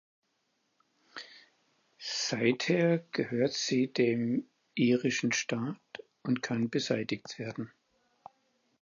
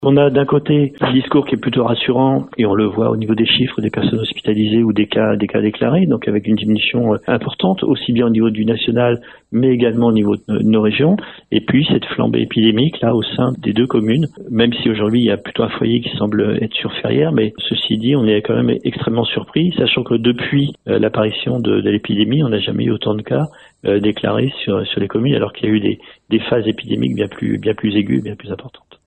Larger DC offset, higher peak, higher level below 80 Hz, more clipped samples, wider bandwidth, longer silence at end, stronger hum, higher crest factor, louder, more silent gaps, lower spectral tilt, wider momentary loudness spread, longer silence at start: second, under 0.1% vs 0.1%; second, -14 dBFS vs 0 dBFS; second, -78 dBFS vs -50 dBFS; neither; second, 7.4 kHz vs 8.2 kHz; first, 1.15 s vs 0.4 s; neither; about the same, 18 dB vs 16 dB; second, -31 LUFS vs -16 LUFS; neither; second, -4.5 dB/octave vs -8.5 dB/octave; first, 18 LU vs 5 LU; first, 1.15 s vs 0 s